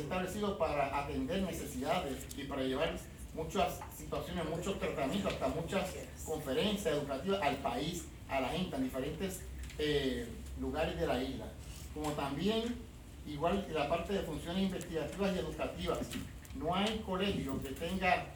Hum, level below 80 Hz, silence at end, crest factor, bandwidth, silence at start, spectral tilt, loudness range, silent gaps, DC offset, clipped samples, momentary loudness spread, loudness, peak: none; -50 dBFS; 0 s; 18 dB; over 20 kHz; 0 s; -5 dB/octave; 2 LU; none; under 0.1%; under 0.1%; 10 LU; -37 LUFS; -18 dBFS